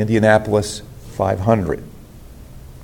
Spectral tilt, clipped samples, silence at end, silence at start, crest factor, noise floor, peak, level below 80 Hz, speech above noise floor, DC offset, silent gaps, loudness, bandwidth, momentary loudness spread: -6.5 dB/octave; under 0.1%; 0 s; 0 s; 18 dB; -39 dBFS; 0 dBFS; -40 dBFS; 22 dB; under 0.1%; none; -18 LUFS; 17 kHz; 18 LU